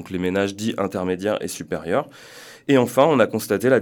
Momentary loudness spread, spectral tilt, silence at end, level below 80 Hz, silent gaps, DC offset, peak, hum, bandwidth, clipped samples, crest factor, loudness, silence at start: 15 LU; -5.5 dB/octave; 0 s; -60 dBFS; none; under 0.1%; -2 dBFS; none; 19 kHz; under 0.1%; 18 dB; -21 LUFS; 0 s